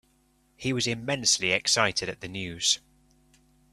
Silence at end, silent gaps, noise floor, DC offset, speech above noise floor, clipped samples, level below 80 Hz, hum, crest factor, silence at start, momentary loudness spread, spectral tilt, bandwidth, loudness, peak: 0.95 s; none; -66 dBFS; under 0.1%; 39 dB; under 0.1%; -60 dBFS; none; 22 dB; 0.6 s; 12 LU; -2 dB/octave; 14 kHz; -26 LUFS; -6 dBFS